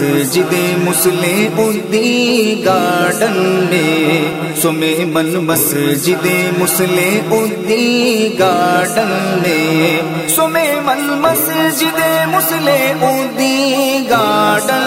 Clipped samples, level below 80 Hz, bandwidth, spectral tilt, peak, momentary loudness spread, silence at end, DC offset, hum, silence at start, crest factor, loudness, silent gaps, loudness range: under 0.1%; -56 dBFS; 16.5 kHz; -4 dB/octave; 0 dBFS; 3 LU; 0 s; under 0.1%; none; 0 s; 12 dB; -13 LUFS; none; 1 LU